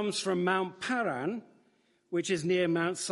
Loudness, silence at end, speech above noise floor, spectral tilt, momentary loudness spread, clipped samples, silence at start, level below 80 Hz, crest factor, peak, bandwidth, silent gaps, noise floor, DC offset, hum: -31 LUFS; 0 s; 39 dB; -4.5 dB/octave; 8 LU; under 0.1%; 0 s; -76 dBFS; 18 dB; -14 dBFS; 11.5 kHz; none; -69 dBFS; under 0.1%; none